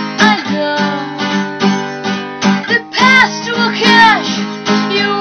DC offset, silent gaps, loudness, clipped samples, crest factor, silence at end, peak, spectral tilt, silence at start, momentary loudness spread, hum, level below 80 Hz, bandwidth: under 0.1%; none; -12 LUFS; under 0.1%; 12 dB; 0 s; 0 dBFS; -4 dB/octave; 0 s; 11 LU; none; -54 dBFS; 9 kHz